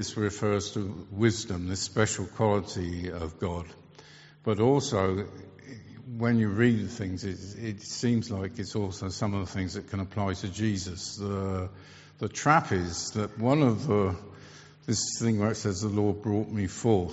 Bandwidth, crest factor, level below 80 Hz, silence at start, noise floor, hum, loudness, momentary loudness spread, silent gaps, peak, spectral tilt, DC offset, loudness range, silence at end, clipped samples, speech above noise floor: 8 kHz; 22 dB; -56 dBFS; 0 s; -52 dBFS; none; -29 LUFS; 13 LU; none; -6 dBFS; -6 dB/octave; under 0.1%; 5 LU; 0 s; under 0.1%; 24 dB